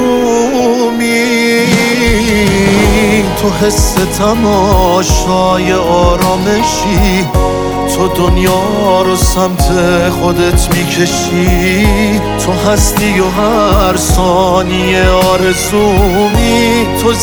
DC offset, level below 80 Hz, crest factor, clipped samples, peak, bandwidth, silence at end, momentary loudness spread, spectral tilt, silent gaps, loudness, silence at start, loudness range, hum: under 0.1%; -18 dBFS; 10 dB; under 0.1%; 0 dBFS; over 20 kHz; 0 s; 3 LU; -4.5 dB/octave; none; -10 LUFS; 0 s; 1 LU; none